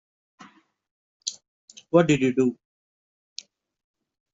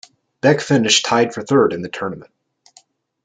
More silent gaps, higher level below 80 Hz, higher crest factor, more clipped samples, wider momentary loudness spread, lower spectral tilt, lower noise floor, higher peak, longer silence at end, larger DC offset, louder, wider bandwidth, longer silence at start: first, 1.48-1.68 s vs none; about the same, -64 dBFS vs -62 dBFS; about the same, 22 dB vs 18 dB; neither; first, 22 LU vs 13 LU; first, -5.5 dB/octave vs -4 dB/octave; about the same, -53 dBFS vs -54 dBFS; second, -6 dBFS vs -2 dBFS; first, 1.8 s vs 1 s; neither; second, -23 LUFS vs -17 LUFS; second, 8 kHz vs 9.6 kHz; first, 1.25 s vs 0.45 s